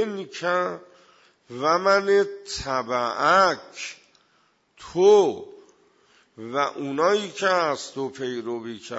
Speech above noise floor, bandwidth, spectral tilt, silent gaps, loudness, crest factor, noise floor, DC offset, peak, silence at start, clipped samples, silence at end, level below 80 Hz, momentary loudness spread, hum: 42 dB; 8 kHz; -4 dB/octave; none; -23 LUFS; 18 dB; -65 dBFS; under 0.1%; -6 dBFS; 0 s; under 0.1%; 0 s; -58 dBFS; 16 LU; none